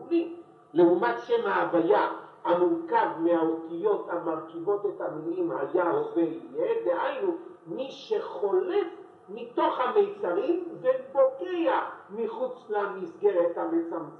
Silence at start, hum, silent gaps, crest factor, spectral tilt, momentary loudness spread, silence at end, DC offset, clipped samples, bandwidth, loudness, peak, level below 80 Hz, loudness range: 0 s; none; none; 16 dB; -7.5 dB/octave; 10 LU; 0 s; under 0.1%; under 0.1%; 6.2 kHz; -28 LUFS; -10 dBFS; -84 dBFS; 4 LU